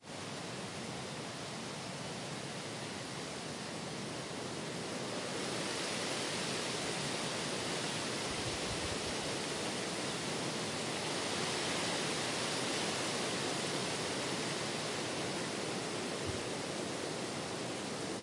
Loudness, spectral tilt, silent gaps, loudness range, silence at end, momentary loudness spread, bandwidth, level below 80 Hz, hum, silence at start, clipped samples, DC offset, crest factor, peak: -37 LUFS; -3 dB/octave; none; 6 LU; 0 s; 7 LU; 11.5 kHz; -66 dBFS; none; 0 s; under 0.1%; under 0.1%; 14 dB; -24 dBFS